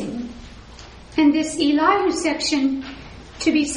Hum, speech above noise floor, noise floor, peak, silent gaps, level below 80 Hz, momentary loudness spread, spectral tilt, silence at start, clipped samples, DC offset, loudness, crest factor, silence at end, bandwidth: none; 22 dB; -41 dBFS; -4 dBFS; none; -46 dBFS; 23 LU; -3.5 dB/octave; 0 s; under 0.1%; under 0.1%; -20 LUFS; 16 dB; 0 s; 10.5 kHz